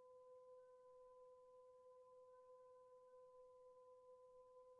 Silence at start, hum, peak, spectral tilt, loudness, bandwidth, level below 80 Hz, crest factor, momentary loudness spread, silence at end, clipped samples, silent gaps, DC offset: 0 s; none; -58 dBFS; -0.5 dB/octave; -67 LUFS; 3 kHz; under -90 dBFS; 8 dB; 2 LU; 0 s; under 0.1%; none; under 0.1%